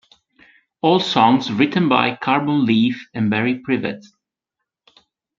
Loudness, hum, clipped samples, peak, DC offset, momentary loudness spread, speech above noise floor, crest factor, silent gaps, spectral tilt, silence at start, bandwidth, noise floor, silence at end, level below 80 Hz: -18 LUFS; none; under 0.1%; 0 dBFS; under 0.1%; 8 LU; 64 dB; 18 dB; none; -6.5 dB/octave; 0.85 s; 7.4 kHz; -82 dBFS; 1.4 s; -62 dBFS